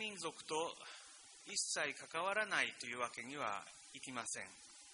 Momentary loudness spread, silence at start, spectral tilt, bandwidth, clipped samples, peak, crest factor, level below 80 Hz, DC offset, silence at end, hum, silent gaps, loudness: 16 LU; 0 s; -1 dB/octave; 10.5 kHz; under 0.1%; -20 dBFS; 24 dB; -86 dBFS; under 0.1%; 0 s; none; none; -42 LUFS